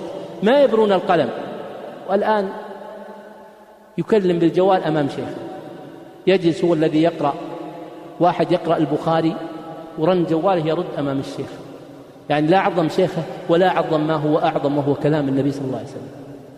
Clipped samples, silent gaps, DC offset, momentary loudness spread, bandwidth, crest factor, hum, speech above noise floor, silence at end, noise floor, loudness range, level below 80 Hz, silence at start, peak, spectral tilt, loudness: under 0.1%; none; under 0.1%; 19 LU; 12 kHz; 16 dB; none; 27 dB; 0 s; -45 dBFS; 3 LU; -60 dBFS; 0 s; -4 dBFS; -7.5 dB/octave; -19 LUFS